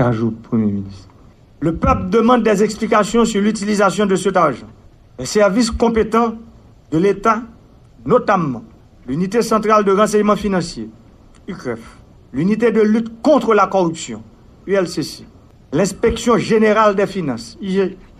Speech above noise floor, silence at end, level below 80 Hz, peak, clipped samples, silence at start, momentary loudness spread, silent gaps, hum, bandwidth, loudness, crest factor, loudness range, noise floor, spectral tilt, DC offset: 30 dB; 0.25 s; -38 dBFS; 0 dBFS; under 0.1%; 0 s; 15 LU; none; none; 14 kHz; -16 LUFS; 16 dB; 3 LU; -45 dBFS; -5.5 dB/octave; under 0.1%